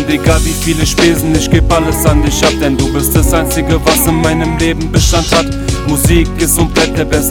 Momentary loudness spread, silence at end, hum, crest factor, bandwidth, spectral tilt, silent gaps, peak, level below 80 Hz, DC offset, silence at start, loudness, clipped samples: 3 LU; 0 s; none; 10 dB; 18.5 kHz; -4.5 dB/octave; none; 0 dBFS; -18 dBFS; under 0.1%; 0 s; -11 LUFS; 0.2%